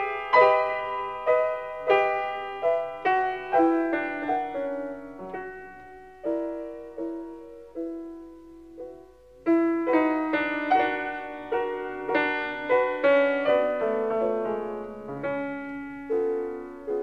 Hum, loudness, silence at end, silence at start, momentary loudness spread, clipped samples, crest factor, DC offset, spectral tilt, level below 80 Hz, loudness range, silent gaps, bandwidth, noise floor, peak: none; -26 LUFS; 0 s; 0 s; 17 LU; under 0.1%; 20 dB; 0.1%; -6.5 dB/octave; -62 dBFS; 11 LU; none; 6.6 kHz; -50 dBFS; -6 dBFS